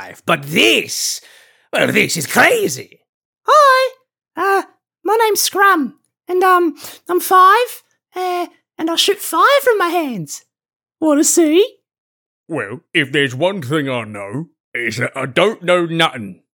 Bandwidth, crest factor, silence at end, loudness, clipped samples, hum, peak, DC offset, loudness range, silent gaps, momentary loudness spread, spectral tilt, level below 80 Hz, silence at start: 19 kHz; 16 dB; 0.25 s; -15 LUFS; under 0.1%; none; 0 dBFS; under 0.1%; 4 LU; 3.09-3.33 s, 10.76-10.80 s, 11.98-12.44 s, 14.60-14.72 s; 15 LU; -3 dB/octave; -72 dBFS; 0 s